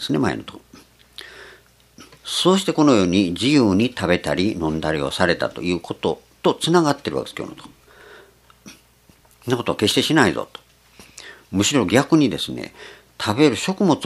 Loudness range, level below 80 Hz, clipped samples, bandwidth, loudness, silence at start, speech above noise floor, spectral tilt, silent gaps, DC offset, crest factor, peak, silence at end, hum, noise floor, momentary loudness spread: 6 LU; -52 dBFS; under 0.1%; 14 kHz; -19 LUFS; 0 s; 35 dB; -4.5 dB/octave; none; under 0.1%; 20 dB; 0 dBFS; 0 s; none; -54 dBFS; 20 LU